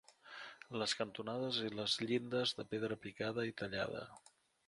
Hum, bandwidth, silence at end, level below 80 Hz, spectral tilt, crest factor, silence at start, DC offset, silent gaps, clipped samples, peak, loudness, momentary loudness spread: none; 11.5 kHz; 0.5 s; -74 dBFS; -4 dB/octave; 20 dB; 0.25 s; under 0.1%; none; under 0.1%; -22 dBFS; -40 LUFS; 15 LU